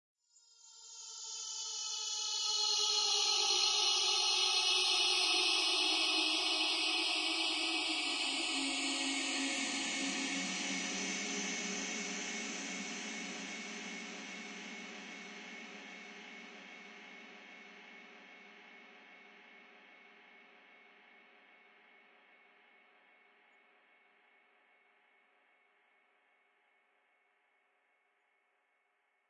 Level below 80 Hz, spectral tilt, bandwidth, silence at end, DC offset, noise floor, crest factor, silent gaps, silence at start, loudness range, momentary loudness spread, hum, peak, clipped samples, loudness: -82 dBFS; 0 dB/octave; 11.5 kHz; 8.85 s; under 0.1%; -78 dBFS; 20 dB; none; 0.65 s; 22 LU; 23 LU; none; -18 dBFS; under 0.1%; -33 LUFS